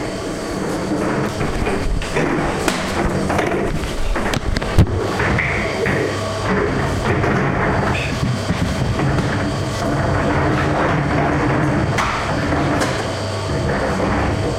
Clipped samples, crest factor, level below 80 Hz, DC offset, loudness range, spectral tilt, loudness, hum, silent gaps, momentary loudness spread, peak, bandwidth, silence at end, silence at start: under 0.1%; 16 dB; -28 dBFS; under 0.1%; 2 LU; -6 dB/octave; -19 LUFS; none; none; 4 LU; -2 dBFS; 16 kHz; 0 s; 0 s